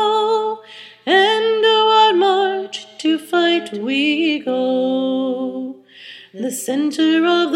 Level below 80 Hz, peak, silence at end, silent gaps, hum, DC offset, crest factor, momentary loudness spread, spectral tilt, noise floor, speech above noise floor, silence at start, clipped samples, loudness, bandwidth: -78 dBFS; -2 dBFS; 0 s; none; none; under 0.1%; 16 dB; 16 LU; -3 dB/octave; -40 dBFS; 22 dB; 0 s; under 0.1%; -17 LUFS; 16 kHz